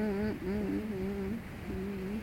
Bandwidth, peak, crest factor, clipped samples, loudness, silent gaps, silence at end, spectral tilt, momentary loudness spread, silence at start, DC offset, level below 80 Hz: 16.5 kHz; -24 dBFS; 12 dB; under 0.1%; -36 LUFS; none; 0 s; -8 dB/octave; 5 LU; 0 s; under 0.1%; -50 dBFS